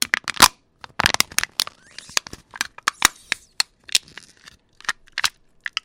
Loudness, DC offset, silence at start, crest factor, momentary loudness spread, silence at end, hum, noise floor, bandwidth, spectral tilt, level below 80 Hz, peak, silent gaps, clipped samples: -21 LUFS; under 0.1%; 0 s; 24 dB; 15 LU; 0.55 s; none; -51 dBFS; 17 kHz; 0.5 dB/octave; -50 dBFS; 0 dBFS; none; under 0.1%